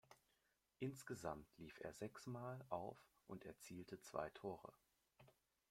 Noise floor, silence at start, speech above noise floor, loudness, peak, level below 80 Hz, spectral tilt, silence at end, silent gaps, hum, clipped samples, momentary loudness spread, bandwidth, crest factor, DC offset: -85 dBFS; 0.1 s; 33 dB; -53 LUFS; -30 dBFS; -80 dBFS; -5.5 dB/octave; 0.4 s; none; none; under 0.1%; 8 LU; 16.5 kHz; 24 dB; under 0.1%